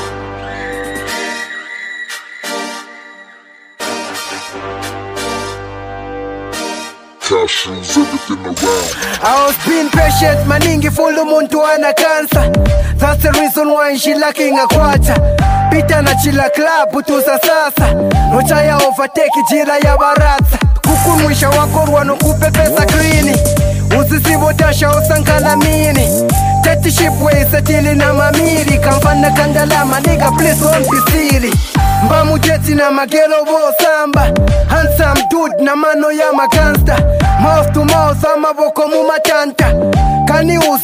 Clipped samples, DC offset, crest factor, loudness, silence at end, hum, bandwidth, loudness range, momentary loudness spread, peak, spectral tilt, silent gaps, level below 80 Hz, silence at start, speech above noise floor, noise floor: under 0.1%; under 0.1%; 10 dB; -11 LUFS; 0 s; none; 16 kHz; 12 LU; 12 LU; 0 dBFS; -5 dB/octave; none; -20 dBFS; 0 s; 30 dB; -40 dBFS